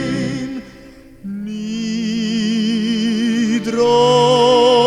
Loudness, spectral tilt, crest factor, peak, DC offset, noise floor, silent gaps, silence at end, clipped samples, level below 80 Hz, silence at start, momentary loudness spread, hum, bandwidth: -16 LUFS; -5 dB/octave; 14 dB; -2 dBFS; under 0.1%; -40 dBFS; none; 0 s; under 0.1%; -50 dBFS; 0 s; 16 LU; none; 11 kHz